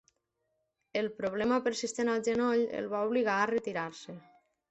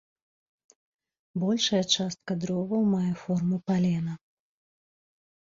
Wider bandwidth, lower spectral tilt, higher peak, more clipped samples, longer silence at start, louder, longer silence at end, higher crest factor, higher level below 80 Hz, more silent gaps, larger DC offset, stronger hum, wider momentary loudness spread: first, 8.4 kHz vs 7.6 kHz; about the same, -4.5 dB/octave vs -5 dB/octave; second, -14 dBFS vs -10 dBFS; neither; second, 0.95 s vs 1.35 s; second, -31 LUFS vs -27 LUFS; second, 0.5 s vs 1.35 s; about the same, 18 dB vs 20 dB; about the same, -70 dBFS vs -66 dBFS; neither; neither; neither; about the same, 10 LU vs 8 LU